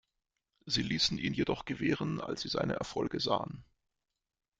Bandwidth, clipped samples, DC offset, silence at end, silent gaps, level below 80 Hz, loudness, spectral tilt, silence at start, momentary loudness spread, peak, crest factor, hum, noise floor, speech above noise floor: 9.4 kHz; under 0.1%; under 0.1%; 0.95 s; none; -60 dBFS; -33 LUFS; -4.5 dB/octave; 0.65 s; 6 LU; -16 dBFS; 20 dB; none; -88 dBFS; 54 dB